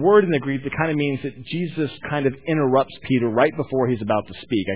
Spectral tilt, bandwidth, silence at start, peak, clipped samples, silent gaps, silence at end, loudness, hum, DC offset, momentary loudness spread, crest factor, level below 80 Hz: -11 dB/octave; 4 kHz; 0 s; -4 dBFS; under 0.1%; none; 0 s; -22 LUFS; none; 0.4%; 8 LU; 18 dB; -54 dBFS